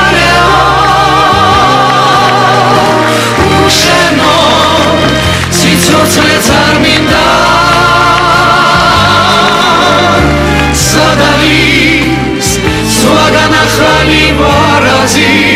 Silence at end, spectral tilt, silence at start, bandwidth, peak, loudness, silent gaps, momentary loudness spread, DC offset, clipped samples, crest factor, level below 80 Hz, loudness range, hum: 0 s; -3.5 dB/octave; 0 s; 16.5 kHz; 0 dBFS; -6 LUFS; none; 3 LU; under 0.1%; 0.4%; 6 dB; -24 dBFS; 1 LU; none